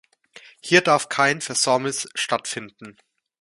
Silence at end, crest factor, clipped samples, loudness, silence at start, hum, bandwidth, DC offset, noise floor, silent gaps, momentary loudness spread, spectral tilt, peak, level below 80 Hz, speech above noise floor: 0.5 s; 24 dB; under 0.1%; -20 LUFS; 0.65 s; none; 11.5 kHz; under 0.1%; -49 dBFS; none; 15 LU; -2.5 dB/octave; 0 dBFS; -70 dBFS; 27 dB